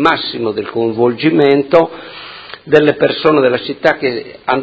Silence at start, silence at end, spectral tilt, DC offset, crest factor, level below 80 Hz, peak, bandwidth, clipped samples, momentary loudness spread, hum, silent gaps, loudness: 0 s; 0 s; -7 dB/octave; under 0.1%; 14 dB; -54 dBFS; 0 dBFS; 8 kHz; 0.3%; 17 LU; none; none; -13 LUFS